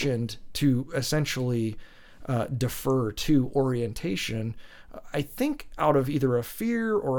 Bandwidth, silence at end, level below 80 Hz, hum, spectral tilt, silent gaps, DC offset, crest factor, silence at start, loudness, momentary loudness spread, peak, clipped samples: 19 kHz; 0 s; -48 dBFS; none; -6 dB/octave; none; under 0.1%; 18 dB; 0 s; -27 LUFS; 10 LU; -8 dBFS; under 0.1%